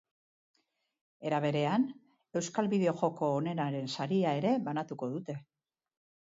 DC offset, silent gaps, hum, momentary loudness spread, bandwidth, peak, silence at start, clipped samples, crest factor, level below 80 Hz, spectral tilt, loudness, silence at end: under 0.1%; none; none; 9 LU; 7.8 kHz; -14 dBFS; 1.2 s; under 0.1%; 20 dB; -80 dBFS; -6.5 dB/octave; -33 LUFS; 0.85 s